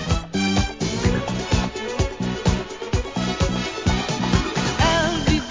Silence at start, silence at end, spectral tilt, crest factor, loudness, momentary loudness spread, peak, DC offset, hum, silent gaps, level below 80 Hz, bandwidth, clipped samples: 0 s; 0 s; -5 dB/octave; 18 dB; -22 LUFS; 6 LU; -4 dBFS; 0.1%; none; none; -30 dBFS; 7.6 kHz; under 0.1%